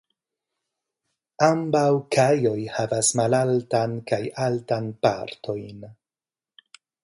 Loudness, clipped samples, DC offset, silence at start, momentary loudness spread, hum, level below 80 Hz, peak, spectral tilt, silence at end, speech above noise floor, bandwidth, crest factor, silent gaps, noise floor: -23 LUFS; under 0.1%; under 0.1%; 1.4 s; 12 LU; none; -64 dBFS; -4 dBFS; -5 dB/octave; 1.1 s; over 67 dB; 11.5 kHz; 22 dB; none; under -90 dBFS